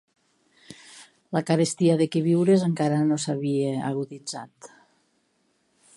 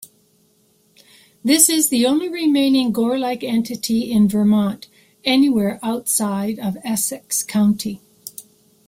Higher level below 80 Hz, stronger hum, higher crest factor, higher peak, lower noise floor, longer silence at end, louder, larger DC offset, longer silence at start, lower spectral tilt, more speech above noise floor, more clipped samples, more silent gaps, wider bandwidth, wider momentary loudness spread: second, -74 dBFS vs -58 dBFS; neither; about the same, 18 dB vs 20 dB; second, -6 dBFS vs 0 dBFS; first, -69 dBFS vs -59 dBFS; first, 1.3 s vs 0.45 s; second, -24 LUFS vs -18 LUFS; neither; first, 0.7 s vs 0 s; first, -6.5 dB/octave vs -3.5 dB/octave; first, 46 dB vs 41 dB; neither; neither; second, 11.5 kHz vs 16 kHz; first, 16 LU vs 12 LU